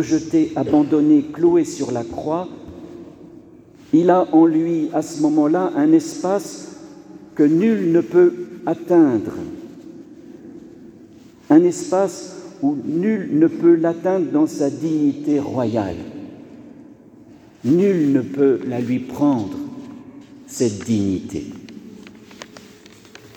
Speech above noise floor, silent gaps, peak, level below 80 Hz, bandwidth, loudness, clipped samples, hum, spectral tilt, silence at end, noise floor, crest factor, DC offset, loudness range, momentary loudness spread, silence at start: 28 dB; none; -2 dBFS; -58 dBFS; 12.5 kHz; -18 LUFS; under 0.1%; none; -7 dB/octave; 0.8 s; -45 dBFS; 18 dB; under 0.1%; 5 LU; 23 LU; 0 s